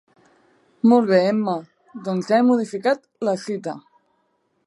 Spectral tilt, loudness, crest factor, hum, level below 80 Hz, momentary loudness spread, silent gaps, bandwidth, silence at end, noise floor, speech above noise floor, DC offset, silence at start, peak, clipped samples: -6.5 dB/octave; -20 LUFS; 18 dB; none; -76 dBFS; 16 LU; none; 11.5 kHz; 0.85 s; -68 dBFS; 49 dB; under 0.1%; 0.85 s; -2 dBFS; under 0.1%